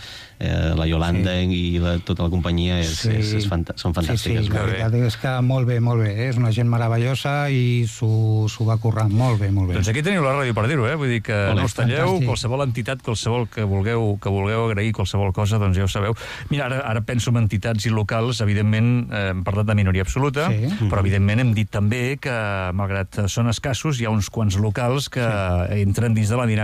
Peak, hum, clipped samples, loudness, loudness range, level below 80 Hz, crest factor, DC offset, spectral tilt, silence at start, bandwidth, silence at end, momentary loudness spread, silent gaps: -10 dBFS; none; under 0.1%; -21 LUFS; 2 LU; -38 dBFS; 10 dB; under 0.1%; -6 dB/octave; 0 s; 14 kHz; 0 s; 4 LU; none